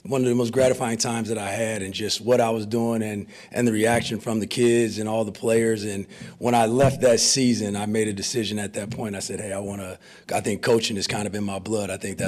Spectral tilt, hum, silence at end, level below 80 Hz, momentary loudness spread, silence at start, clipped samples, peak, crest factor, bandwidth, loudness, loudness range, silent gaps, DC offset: -4.5 dB/octave; none; 0 s; -56 dBFS; 11 LU; 0.05 s; under 0.1%; -10 dBFS; 14 dB; 15.5 kHz; -23 LUFS; 5 LU; none; under 0.1%